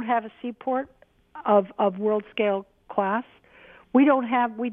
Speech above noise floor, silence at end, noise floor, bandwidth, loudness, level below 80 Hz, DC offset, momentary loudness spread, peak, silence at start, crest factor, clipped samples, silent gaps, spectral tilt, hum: 28 dB; 0 s; -52 dBFS; 3.8 kHz; -24 LUFS; -68 dBFS; under 0.1%; 12 LU; -6 dBFS; 0 s; 18 dB; under 0.1%; none; -9.5 dB/octave; none